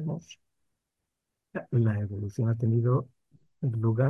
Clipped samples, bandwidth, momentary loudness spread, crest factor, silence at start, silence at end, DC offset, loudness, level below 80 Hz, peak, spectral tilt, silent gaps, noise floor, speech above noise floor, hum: under 0.1%; 6.4 kHz; 14 LU; 16 dB; 0 s; 0 s; under 0.1%; -29 LUFS; -58 dBFS; -14 dBFS; -9.5 dB/octave; none; -85 dBFS; 58 dB; none